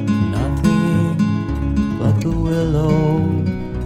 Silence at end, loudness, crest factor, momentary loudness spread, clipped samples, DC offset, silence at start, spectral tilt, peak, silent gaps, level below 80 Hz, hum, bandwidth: 0 s; -18 LUFS; 14 dB; 4 LU; under 0.1%; under 0.1%; 0 s; -8 dB/octave; -2 dBFS; none; -28 dBFS; none; 14 kHz